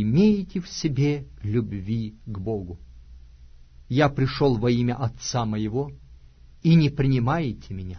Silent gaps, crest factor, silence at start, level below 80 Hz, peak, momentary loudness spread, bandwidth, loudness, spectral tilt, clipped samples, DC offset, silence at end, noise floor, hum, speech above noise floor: none; 18 dB; 0 s; -44 dBFS; -6 dBFS; 12 LU; 6.6 kHz; -24 LUFS; -7 dB/octave; under 0.1%; under 0.1%; 0 s; -49 dBFS; none; 26 dB